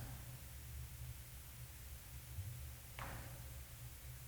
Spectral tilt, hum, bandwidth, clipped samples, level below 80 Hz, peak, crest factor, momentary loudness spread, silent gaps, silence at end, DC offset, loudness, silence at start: -4 dB/octave; none; over 20 kHz; under 0.1%; -56 dBFS; -32 dBFS; 20 dB; 4 LU; none; 0 s; under 0.1%; -52 LUFS; 0 s